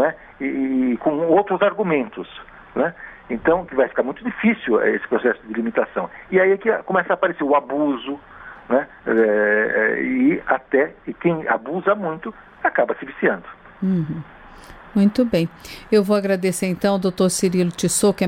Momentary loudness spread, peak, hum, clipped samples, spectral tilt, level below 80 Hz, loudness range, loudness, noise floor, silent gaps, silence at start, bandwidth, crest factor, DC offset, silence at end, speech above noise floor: 11 LU; -4 dBFS; none; under 0.1%; -5.5 dB/octave; -52 dBFS; 3 LU; -20 LUFS; -42 dBFS; none; 0 s; 16.5 kHz; 16 dB; under 0.1%; 0 s; 22 dB